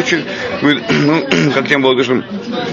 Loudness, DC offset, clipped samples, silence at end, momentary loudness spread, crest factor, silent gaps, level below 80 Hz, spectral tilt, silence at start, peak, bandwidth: -14 LUFS; under 0.1%; under 0.1%; 0 s; 8 LU; 14 dB; none; -52 dBFS; -5 dB/octave; 0 s; 0 dBFS; 7.4 kHz